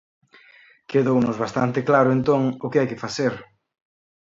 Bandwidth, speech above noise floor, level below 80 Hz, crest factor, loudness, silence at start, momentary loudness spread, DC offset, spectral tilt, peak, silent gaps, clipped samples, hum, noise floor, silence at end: 7.8 kHz; 32 dB; -60 dBFS; 18 dB; -21 LUFS; 0.9 s; 7 LU; under 0.1%; -7 dB/octave; -4 dBFS; none; under 0.1%; none; -53 dBFS; 0.9 s